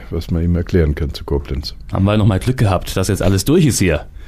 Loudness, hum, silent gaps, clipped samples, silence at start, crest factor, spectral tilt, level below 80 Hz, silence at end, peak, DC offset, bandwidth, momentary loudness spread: -17 LUFS; none; none; under 0.1%; 0 s; 12 dB; -6 dB/octave; -26 dBFS; 0 s; -4 dBFS; under 0.1%; 15.5 kHz; 9 LU